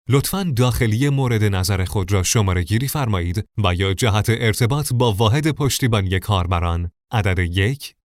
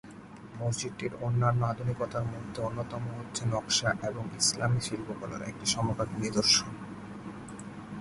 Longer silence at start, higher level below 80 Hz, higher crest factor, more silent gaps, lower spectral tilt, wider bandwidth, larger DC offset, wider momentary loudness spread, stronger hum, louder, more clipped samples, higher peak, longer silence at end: about the same, 0.1 s vs 0.05 s; first, -36 dBFS vs -56 dBFS; second, 16 dB vs 22 dB; neither; first, -5 dB/octave vs -3.5 dB/octave; first, 16 kHz vs 11.5 kHz; neither; second, 4 LU vs 17 LU; neither; first, -19 LUFS vs -30 LUFS; neither; first, -2 dBFS vs -10 dBFS; first, 0.15 s vs 0 s